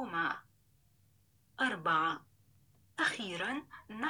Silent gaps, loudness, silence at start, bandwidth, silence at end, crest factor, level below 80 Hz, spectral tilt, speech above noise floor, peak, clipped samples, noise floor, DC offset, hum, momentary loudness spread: none; -35 LUFS; 0 s; over 20 kHz; 0 s; 20 dB; -78 dBFS; -3.5 dB/octave; 35 dB; -18 dBFS; under 0.1%; -70 dBFS; under 0.1%; none; 16 LU